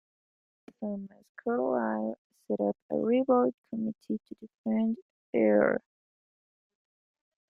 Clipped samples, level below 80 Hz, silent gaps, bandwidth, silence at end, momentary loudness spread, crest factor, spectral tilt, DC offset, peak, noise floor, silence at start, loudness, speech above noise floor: under 0.1%; -76 dBFS; 1.29-1.35 s, 2.18-2.30 s, 2.82-2.89 s, 3.54-3.62 s, 4.54-4.64 s, 5.02-5.33 s; 3.2 kHz; 1.75 s; 15 LU; 22 dB; -9.5 dB/octave; under 0.1%; -10 dBFS; under -90 dBFS; 0.8 s; -30 LUFS; over 61 dB